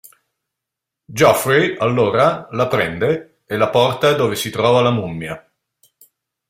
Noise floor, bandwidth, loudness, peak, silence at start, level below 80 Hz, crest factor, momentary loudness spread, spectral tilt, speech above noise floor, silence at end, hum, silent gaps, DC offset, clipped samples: -82 dBFS; 16 kHz; -16 LUFS; -2 dBFS; 1.1 s; -54 dBFS; 16 dB; 12 LU; -5 dB/octave; 66 dB; 1.1 s; none; none; under 0.1%; under 0.1%